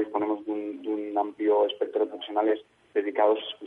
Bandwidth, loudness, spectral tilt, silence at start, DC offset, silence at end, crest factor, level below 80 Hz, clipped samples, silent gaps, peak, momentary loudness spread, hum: 3.9 kHz; -27 LUFS; -6 dB/octave; 0 s; under 0.1%; 0 s; 16 dB; -78 dBFS; under 0.1%; none; -10 dBFS; 8 LU; none